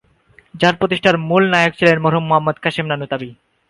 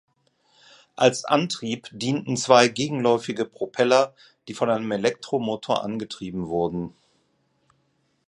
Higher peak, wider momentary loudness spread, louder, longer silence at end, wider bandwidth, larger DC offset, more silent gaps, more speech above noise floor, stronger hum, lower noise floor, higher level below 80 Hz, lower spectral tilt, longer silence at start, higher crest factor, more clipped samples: about the same, 0 dBFS vs 0 dBFS; second, 9 LU vs 13 LU; first, -16 LUFS vs -23 LUFS; second, 0.35 s vs 1.4 s; about the same, 11.5 kHz vs 11.5 kHz; neither; neither; second, 36 dB vs 46 dB; neither; second, -52 dBFS vs -69 dBFS; first, -54 dBFS vs -62 dBFS; first, -6 dB/octave vs -4.5 dB/octave; second, 0.55 s vs 1 s; second, 16 dB vs 24 dB; neither